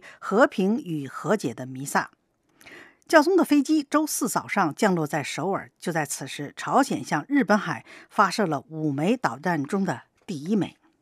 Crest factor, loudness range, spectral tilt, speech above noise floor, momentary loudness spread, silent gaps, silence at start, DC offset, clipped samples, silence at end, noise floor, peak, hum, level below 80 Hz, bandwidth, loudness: 22 dB; 3 LU; -5 dB/octave; 32 dB; 12 LU; none; 0.05 s; under 0.1%; under 0.1%; 0.3 s; -56 dBFS; -2 dBFS; none; -76 dBFS; 15.5 kHz; -25 LUFS